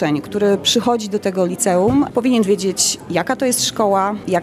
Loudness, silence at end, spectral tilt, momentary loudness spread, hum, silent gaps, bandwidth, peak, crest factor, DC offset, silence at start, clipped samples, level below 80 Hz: -17 LUFS; 0 s; -3.5 dB/octave; 4 LU; none; none; 14.5 kHz; -2 dBFS; 14 dB; under 0.1%; 0 s; under 0.1%; -50 dBFS